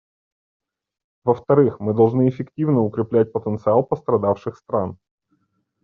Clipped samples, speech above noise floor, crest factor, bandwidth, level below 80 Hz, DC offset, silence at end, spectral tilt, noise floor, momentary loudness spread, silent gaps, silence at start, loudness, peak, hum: under 0.1%; 49 dB; 18 dB; 4.6 kHz; -60 dBFS; under 0.1%; 0.9 s; -10 dB/octave; -68 dBFS; 8 LU; none; 1.25 s; -20 LUFS; -4 dBFS; none